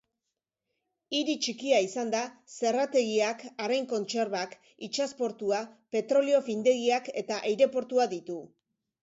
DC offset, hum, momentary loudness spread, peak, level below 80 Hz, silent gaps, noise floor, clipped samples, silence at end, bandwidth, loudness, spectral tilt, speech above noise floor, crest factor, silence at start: under 0.1%; none; 9 LU; -12 dBFS; -80 dBFS; none; -87 dBFS; under 0.1%; 0.55 s; 8 kHz; -29 LUFS; -3 dB/octave; 58 dB; 18 dB; 1.1 s